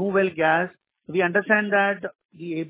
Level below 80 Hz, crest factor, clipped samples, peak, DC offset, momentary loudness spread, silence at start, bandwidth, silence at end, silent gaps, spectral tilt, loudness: -68 dBFS; 20 dB; under 0.1%; -4 dBFS; under 0.1%; 13 LU; 0 s; 4 kHz; 0 s; 2.25-2.29 s; -9.5 dB/octave; -22 LUFS